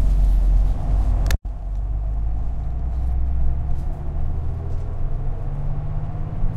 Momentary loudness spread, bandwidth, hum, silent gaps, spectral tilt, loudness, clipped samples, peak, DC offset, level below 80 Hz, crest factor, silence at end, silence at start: 9 LU; 7.4 kHz; none; none; -7.5 dB/octave; -26 LUFS; under 0.1%; -6 dBFS; under 0.1%; -20 dBFS; 14 dB; 0 s; 0 s